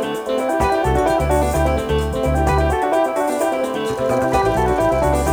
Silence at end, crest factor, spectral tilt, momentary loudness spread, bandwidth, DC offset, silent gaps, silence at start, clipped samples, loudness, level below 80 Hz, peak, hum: 0 s; 14 dB; -6 dB/octave; 4 LU; over 20 kHz; under 0.1%; none; 0 s; under 0.1%; -18 LUFS; -26 dBFS; -4 dBFS; none